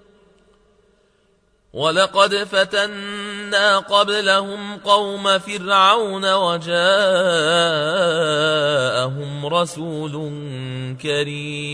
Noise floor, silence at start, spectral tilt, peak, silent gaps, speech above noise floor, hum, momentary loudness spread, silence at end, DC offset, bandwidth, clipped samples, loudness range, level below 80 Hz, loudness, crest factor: -60 dBFS; 1.75 s; -3.5 dB/octave; 0 dBFS; none; 42 dB; none; 12 LU; 0 s; under 0.1%; 11 kHz; under 0.1%; 4 LU; -62 dBFS; -18 LUFS; 20 dB